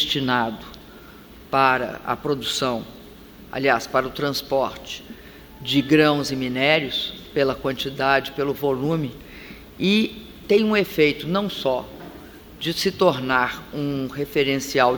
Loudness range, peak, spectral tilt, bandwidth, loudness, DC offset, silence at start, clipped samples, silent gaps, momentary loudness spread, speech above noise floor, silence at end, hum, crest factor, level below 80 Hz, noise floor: 3 LU; -2 dBFS; -4.5 dB/octave; over 20 kHz; -22 LUFS; under 0.1%; 0 s; under 0.1%; none; 19 LU; 22 dB; 0 s; none; 22 dB; -50 dBFS; -44 dBFS